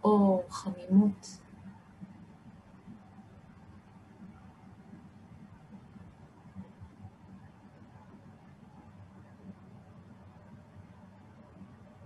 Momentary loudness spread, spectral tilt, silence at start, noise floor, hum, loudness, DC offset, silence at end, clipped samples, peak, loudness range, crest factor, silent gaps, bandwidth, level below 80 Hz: 27 LU; -8 dB/octave; 0.05 s; -55 dBFS; none; -28 LUFS; under 0.1%; 0.4 s; under 0.1%; -14 dBFS; 19 LU; 22 dB; none; 11 kHz; -68 dBFS